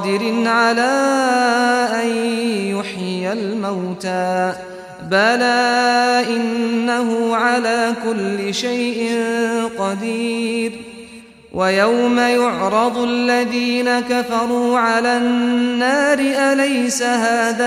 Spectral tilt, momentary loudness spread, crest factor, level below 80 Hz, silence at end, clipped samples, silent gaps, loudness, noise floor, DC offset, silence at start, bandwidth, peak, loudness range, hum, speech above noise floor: -4 dB/octave; 8 LU; 14 dB; -58 dBFS; 0 s; under 0.1%; none; -17 LUFS; -40 dBFS; under 0.1%; 0 s; 14.5 kHz; -4 dBFS; 4 LU; none; 23 dB